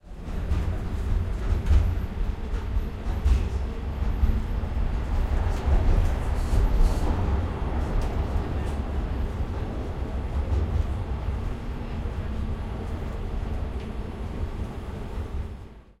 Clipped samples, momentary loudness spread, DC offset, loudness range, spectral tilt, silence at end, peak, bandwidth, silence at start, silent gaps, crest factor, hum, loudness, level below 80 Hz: under 0.1%; 9 LU; under 0.1%; 6 LU; -7.5 dB/octave; 0.2 s; -8 dBFS; 12.5 kHz; 0.05 s; none; 16 dB; none; -29 LUFS; -26 dBFS